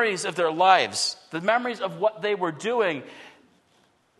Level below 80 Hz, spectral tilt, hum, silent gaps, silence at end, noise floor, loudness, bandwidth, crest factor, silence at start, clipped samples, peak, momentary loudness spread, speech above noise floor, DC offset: -80 dBFS; -3 dB/octave; none; none; 0.9 s; -64 dBFS; -24 LUFS; 12.5 kHz; 22 dB; 0 s; under 0.1%; -4 dBFS; 10 LU; 39 dB; under 0.1%